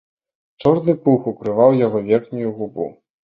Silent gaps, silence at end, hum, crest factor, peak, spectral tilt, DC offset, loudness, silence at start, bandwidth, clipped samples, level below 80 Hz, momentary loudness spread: none; 0.35 s; none; 18 dB; -2 dBFS; -10.5 dB/octave; under 0.1%; -18 LUFS; 0.6 s; 5 kHz; under 0.1%; -58 dBFS; 12 LU